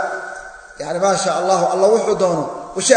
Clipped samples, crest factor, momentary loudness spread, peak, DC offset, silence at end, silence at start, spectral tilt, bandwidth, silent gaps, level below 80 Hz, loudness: under 0.1%; 18 dB; 16 LU; 0 dBFS; under 0.1%; 0 s; 0 s; -3.5 dB/octave; 9.4 kHz; none; -54 dBFS; -17 LUFS